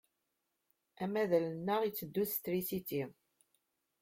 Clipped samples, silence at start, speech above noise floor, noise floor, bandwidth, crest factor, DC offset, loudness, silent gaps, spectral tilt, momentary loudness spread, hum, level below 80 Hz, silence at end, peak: under 0.1%; 1 s; 49 dB; -85 dBFS; 16.5 kHz; 20 dB; under 0.1%; -36 LUFS; none; -5.5 dB/octave; 8 LU; none; -76 dBFS; 0.9 s; -18 dBFS